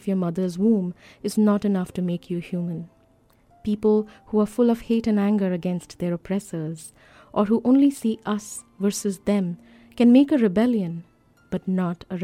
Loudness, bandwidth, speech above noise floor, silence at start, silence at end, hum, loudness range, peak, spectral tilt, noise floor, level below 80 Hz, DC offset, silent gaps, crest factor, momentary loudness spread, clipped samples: -23 LUFS; 15 kHz; 37 dB; 0.05 s; 0 s; none; 4 LU; -6 dBFS; -7 dB/octave; -59 dBFS; -56 dBFS; under 0.1%; none; 18 dB; 13 LU; under 0.1%